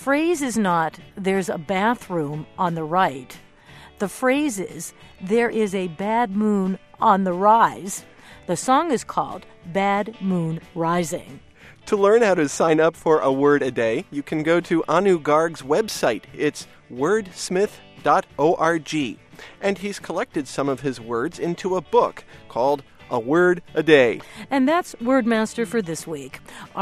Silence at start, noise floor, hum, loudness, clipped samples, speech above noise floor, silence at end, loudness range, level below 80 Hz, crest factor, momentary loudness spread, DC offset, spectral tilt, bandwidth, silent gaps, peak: 0 s; -46 dBFS; none; -21 LUFS; under 0.1%; 25 dB; 0 s; 5 LU; -56 dBFS; 20 dB; 12 LU; under 0.1%; -5 dB/octave; 15 kHz; none; -2 dBFS